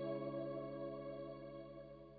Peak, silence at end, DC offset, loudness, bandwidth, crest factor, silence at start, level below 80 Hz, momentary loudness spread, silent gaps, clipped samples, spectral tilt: -32 dBFS; 0 s; under 0.1%; -48 LUFS; 4.8 kHz; 14 dB; 0 s; -70 dBFS; 10 LU; none; under 0.1%; -7 dB/octave